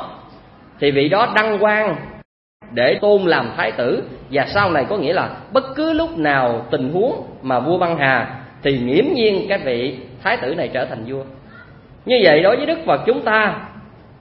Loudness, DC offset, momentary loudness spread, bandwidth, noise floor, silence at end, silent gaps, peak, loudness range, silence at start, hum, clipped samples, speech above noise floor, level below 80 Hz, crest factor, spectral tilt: -17 LUFS; under 0.1%; 12 LU; 5.8 kHz; -43 dBFS; 0.35 s; 2.25-2.60 s; 0 dBFS; 2 LU; 0 s; none; under 0.1%; 26 dB; -50 dBFS; 18 dB; -8 dB/octave